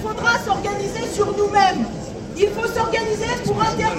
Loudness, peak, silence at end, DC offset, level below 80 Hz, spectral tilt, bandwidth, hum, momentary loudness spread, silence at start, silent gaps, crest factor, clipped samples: -20 LUFS; -4 dBFS; 0 s; under 0.1%; -42 dBFS; -4.5 dB/octave; 15.5 kHz; none; 8 LU; 0 s; none; 16 dB; under 0.1%